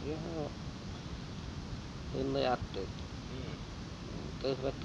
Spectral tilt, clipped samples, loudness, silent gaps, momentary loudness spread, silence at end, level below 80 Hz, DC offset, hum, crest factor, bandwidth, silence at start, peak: -6 dB/octave; under 0.1%; -40 LUFS; none; 10 LU; 0 s; -50 dBFS; under 0.1%; none; 20 dB; 11.5 kHz; 0 s; -18 dBFS